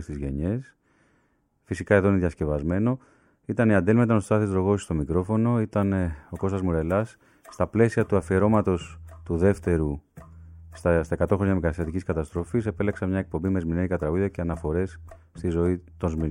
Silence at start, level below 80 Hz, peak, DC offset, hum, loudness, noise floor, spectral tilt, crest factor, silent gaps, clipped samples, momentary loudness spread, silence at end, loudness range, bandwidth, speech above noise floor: 0 s; -42 dBFS; -6 dBFS; under 0.1%; none; -25 LUFS; -68 dBFS; -8.5 dB/octave; 20 dB; none; under 0.1%; 10 LU; 0 s; 4 LU; 11.5 kHz; 43 dB